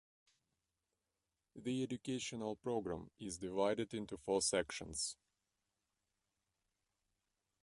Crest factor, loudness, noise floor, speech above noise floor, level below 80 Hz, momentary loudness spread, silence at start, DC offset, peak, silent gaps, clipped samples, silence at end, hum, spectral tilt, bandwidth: 22 dB; -41 LUFS; under -90 dBFS; over 49 dB; -70 dBFS; 10 LU; 1.55 s; under 0.1%; -22 dBFS; none; under 0.1%; 2.5 s; none; -3.5 dB/octave; 11.5 kHz